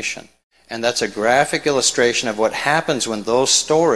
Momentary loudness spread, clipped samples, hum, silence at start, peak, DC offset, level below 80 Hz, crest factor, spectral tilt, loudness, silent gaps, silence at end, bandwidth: 8 LU; under 0.1%; none; 0 s; 0 dBFS; 0.3%; -54 dBFS; 18 dB; -2 dB/octave; -17 LUFS; 0.44-0.50 s; 0 s; 13.5 kHz